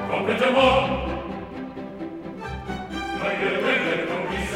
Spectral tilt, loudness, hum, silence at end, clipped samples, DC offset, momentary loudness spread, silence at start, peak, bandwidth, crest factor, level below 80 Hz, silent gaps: -5 dB/octave; -23 LUFS; none; 0 s; under 0.1%; under 0.1%; 16 LU; 0 s; -4 dBFS; 14.5 kHz; 20 dB; -42 dBFS; none